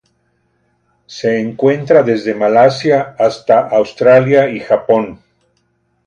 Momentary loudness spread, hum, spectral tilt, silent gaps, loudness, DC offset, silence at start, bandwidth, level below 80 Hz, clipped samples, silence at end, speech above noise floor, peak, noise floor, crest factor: 7 LU; none; -6.5 dB/octave; none; -12 LUFS; under 0.1%; 1.1 s; 9.4 kHz; -56 dBFS; under 0.1%; 0.9 s; 50 dB; 0 dBFS; -62 dBFS; 14 dB